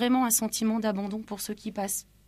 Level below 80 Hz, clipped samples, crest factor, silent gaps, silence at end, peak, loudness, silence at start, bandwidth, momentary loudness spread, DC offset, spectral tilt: -62 dBFS; under 0.1%; 16 dB; none; 0.25 s; -12 dBFS; -28 LUFS; 0 s; 15.5 kHz; 11 LU; under 0.1%; -3.5 dB/octave